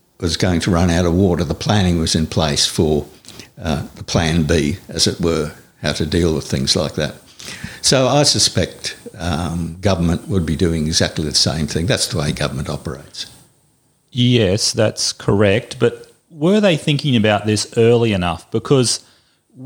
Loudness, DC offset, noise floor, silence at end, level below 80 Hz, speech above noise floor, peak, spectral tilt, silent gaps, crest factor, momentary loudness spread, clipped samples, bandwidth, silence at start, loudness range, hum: -17 LUFS; under 0.1%; -59 dBFS; 0 s; -36 dBFS; 42 dB; 0 dBFS; -4.5 dB/octave; none; 16 dB; 13 LU; under 0.1%; over 20 kHz; 0.2 s; 3 LU; none